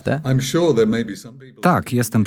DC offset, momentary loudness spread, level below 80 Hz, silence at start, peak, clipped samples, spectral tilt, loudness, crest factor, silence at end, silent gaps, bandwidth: under 0.1%; 9 LU; -50 dBFS; 0.05 s; -2 dBFS; under 0.1%; -6 dB/octave; -18 LUFS; 16 dB; 0 s; none; 18 kHz